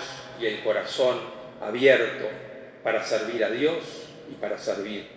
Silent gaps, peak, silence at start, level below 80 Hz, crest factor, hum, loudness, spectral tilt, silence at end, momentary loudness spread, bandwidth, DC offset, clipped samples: none; -6 dBFS; 0 s; -68 dBFS; 20 dB; none; -26 LUFS; -4 dB/octave; 0 s; 19 LU; 8 kHz; under 0.1%; under 0.1%